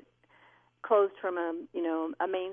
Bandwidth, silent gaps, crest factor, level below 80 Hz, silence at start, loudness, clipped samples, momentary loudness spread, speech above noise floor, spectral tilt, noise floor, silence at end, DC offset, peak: 3.6 kHz; none; 18 dB; -80 dBFS; 0.85 s; -31 LUFS; under 0.1%; 8 LU; 33 dB; -7.5 dB/octave; -63 dBFS; 0 s; under 0.1%; -14 dBFS